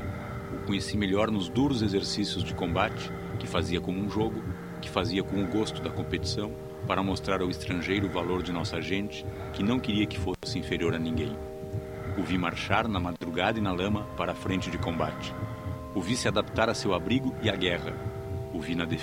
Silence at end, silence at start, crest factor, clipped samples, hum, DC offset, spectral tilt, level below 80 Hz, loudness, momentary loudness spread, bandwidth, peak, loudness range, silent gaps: 0 s; 0 s; 24 dB; under 0.1%; none; under 0.1%; -5.5 dB/octave; -46 dBFS; -30 LUFS; 9 LU; 16 kHz; -6 dBFS; 2 LU; none